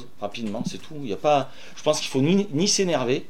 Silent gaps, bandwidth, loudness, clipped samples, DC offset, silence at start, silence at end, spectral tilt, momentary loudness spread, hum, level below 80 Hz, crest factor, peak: none; 16 kHz; -24 LUFS; under 0.1%; 2%; 0 s; 0.05 s; -4 dB/octave; 12 LU; none; -62 dBFS; 18 dB; -6 dBFS